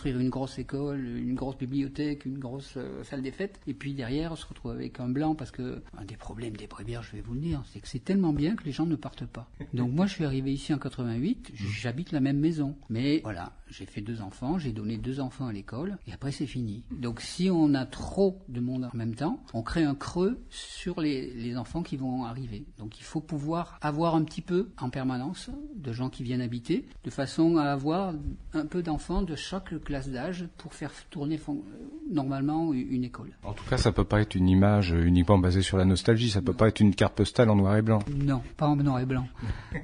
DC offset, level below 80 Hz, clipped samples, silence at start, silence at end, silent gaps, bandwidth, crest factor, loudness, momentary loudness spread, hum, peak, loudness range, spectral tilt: under 0.1%; -46 dBFS; under 0.1%; 0 s; 0 s; none; 10.5 kHz; 20 dB; -29 LUFS; 15 LU; none; -8 dBFS; 10 LU; -7 dB/octave